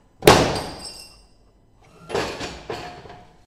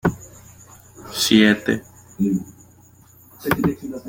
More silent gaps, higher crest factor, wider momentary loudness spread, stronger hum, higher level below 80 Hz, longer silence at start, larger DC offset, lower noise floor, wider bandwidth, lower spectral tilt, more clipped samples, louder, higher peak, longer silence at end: neither; about the same, 24 dB vs 20 dB; about the same, 23 LU vs 21 LU; neither; first, -42 dBFS vs -50 dBFS; first, 0.2 s vs 0.05 s; neither; first, -55 dBFS vs -50 dBFS; about the same, 16 kHz vs 17 kHz; about the same, -4 dB/octave vs -4.5 dB/octave; neither; about the same, -21 LUFS vs -20 LUFS; about the same, 0 dBFS vs -2 dBFS; first, 0.3 s vs 0 s